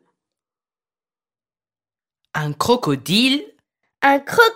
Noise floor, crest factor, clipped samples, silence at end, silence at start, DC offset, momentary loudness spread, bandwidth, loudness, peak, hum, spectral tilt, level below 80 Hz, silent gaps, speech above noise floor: under -90 dBFS; 20 dB; under 0.1%; 0 s; 2.35 s; under 0.1%; 10 LU; 16 kHz; -18 LUFS; 0 dBFS; none; -4 dB/octave; -60 dBFS; none; over 73 dB